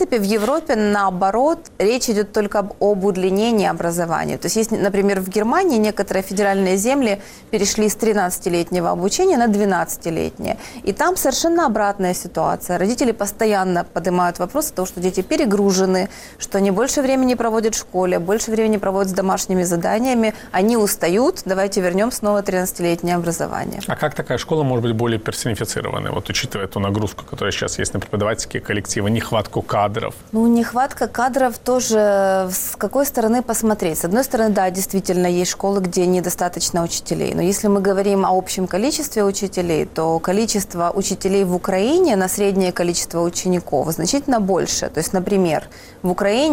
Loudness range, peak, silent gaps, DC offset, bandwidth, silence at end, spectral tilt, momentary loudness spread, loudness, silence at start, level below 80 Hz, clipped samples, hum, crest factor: 3 LU; -6 dBFS; none; under 0.1%; 17 kHz; 0 s; -4.5 dB/octave; 6 LU; -19 LUFS; 0 s; -44 dBFS; under 0.1%; none; 12 dB